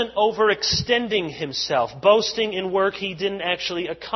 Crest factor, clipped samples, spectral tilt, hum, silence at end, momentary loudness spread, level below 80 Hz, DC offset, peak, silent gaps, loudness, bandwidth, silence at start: 18 dB; under 0.1%; -3.5 dB/octave; none; 0 s; 8 LU; -50 dBFS; under 0.1%; -4 dBFS; none; -21 LUFS; 6.2 kHz; 0 s